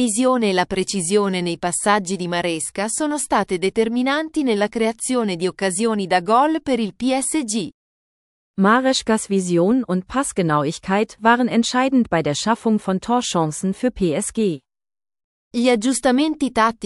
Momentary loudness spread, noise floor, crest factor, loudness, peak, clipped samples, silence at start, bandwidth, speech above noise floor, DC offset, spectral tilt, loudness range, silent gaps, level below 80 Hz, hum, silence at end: 6 LU; under -90 dBFS; 18 dB; -19 LUFS; -2 dBFS; under 0.1%; 0 s; 13.5 kHz; over 71 dB; under 0.1%; -4.5 dB/octave; 2 LU; 7.74-8.54 s, 15.24-15.51 s; -52 dBFS; none; 0 s